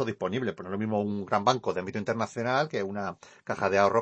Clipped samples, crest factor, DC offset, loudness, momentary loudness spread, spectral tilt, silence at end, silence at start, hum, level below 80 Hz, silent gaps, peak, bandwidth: under 0.1%; 22 dB; under 0.1%; -29 LUFS; 9 LU; -5.5 dB/octave; 0 s; 0 s; none; -70 dBFS; none; -8 dBFS; 8.6 kHz